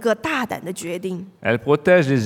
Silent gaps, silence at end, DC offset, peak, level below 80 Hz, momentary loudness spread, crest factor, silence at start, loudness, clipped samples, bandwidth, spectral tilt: none; 0 s; under 0.1%; -2 dBFS; -58 dBFS; 12 LU; 18 dB; 0 s; -21 LUFS; under 0.1%; 16.5 kHz; -6 dB/octave